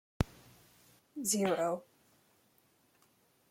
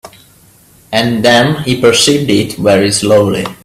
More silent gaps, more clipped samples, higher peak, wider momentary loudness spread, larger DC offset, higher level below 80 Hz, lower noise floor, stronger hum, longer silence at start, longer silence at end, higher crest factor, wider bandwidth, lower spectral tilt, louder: neither; neither; second, -12 dBFS vs 0 dBFS; first, 11 LU vs 6 LU; neither; second, -54 dBFS vs -44 dBFS; first, -71 dBFS vs -44 dBFS; neither; first, 0.2 s vs 0.05 s; first, 1.7 s vs 0.1 s; first, 26 dB vs 12 dB; about the same, 16.5 kHz vs 16 kHz; about the same, -4 dB/octave vs -4 dB/octave; second, -35 LUFS vs -10 LUFS